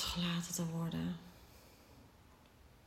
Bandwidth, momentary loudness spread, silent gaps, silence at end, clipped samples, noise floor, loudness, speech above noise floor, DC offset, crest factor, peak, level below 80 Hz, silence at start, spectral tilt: 16 kHz; 24 LU; none; 0.05 s; under 0.1%; -63 dBFS; -40 LUFS; 24 dB; under 0.1%; 16 dB; -26 dBFS; -62 dBFS; 0 s; -4 dB/octave